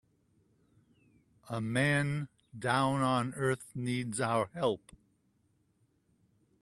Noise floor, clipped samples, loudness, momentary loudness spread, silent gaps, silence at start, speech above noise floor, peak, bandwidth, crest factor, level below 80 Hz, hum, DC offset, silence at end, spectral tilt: -73 dBFS; under 0.1%; -32 LUFS; 10 LU; none; 1.45 s; 41 dB; -14 dBFS; 12.5 kHz; 22 dB; -68 dBFS; none; under 0.1%; 1.85 s; -5.5 dB/octave